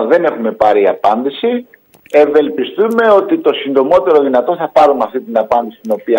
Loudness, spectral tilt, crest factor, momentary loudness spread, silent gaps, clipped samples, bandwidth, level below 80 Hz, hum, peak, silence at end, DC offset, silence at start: -12 LUFS; -6 dB/octave; 12 dB; 7 LU; none; under 0.1%; 16.5 kHz; -54 dBFS; none; 0 dBFS; 0 s; under 0.1%; 0 s